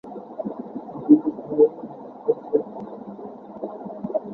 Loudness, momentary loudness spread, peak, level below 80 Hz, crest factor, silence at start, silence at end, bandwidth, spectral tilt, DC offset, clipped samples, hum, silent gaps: -23 LUFS; 20 LU; -2 dBFS; -70 dBFS; 22 dB; 0.05 s; 0 s; 2 kHz; -12 dB/octave; under 0.1%; under 0.1%; none; none